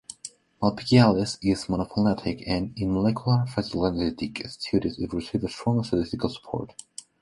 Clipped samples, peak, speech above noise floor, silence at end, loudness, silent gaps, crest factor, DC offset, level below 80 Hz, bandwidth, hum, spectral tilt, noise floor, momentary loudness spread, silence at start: under 0.1%; -4 dBFS; 20 dB; 0.55 s; -26 LUFS; none; 22 dB; under 0.1%; -48 dBFS; 11.5 kHz; none; -6.5 dB/octave; -45 dBFS; 13 LU; 0.1 s